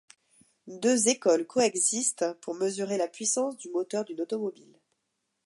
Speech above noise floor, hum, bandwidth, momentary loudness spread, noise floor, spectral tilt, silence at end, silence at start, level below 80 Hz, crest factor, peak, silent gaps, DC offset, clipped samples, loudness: 52 dB; none; 11.5 kHz; 10 LU; -80 dBFS; -2.5 dB/octave; 0.95 s; 0.65 s; -82 dBFS; 18 dB; -10 dBFS; none; under 0.1%; under 0.1%; -28 LUFS